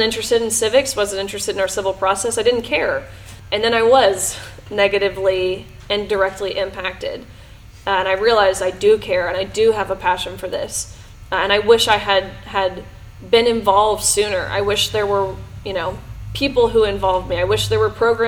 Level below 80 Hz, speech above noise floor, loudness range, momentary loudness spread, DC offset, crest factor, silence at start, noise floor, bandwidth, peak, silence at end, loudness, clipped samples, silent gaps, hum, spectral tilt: -40 dBFS; 23 dB; 3 LU; 11 LU; under 0.1%; 18 dB; 0 s; -40 dBFS; 18.5 kHz; 0 dBFS; 0 s; -18 LUFS; under 0.1%; none; none; -3 dB/octave